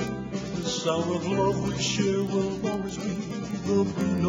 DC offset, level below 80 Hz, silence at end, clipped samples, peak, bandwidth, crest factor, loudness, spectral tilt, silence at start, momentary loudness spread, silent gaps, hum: under 0.1%; -50 dBFS; 0 s; under 0.1%; -12 dBFS; 12.5 kHz; 16 dB; -27 LUFS; -5.5 dB/octave; 0 s; 7 LU; none; none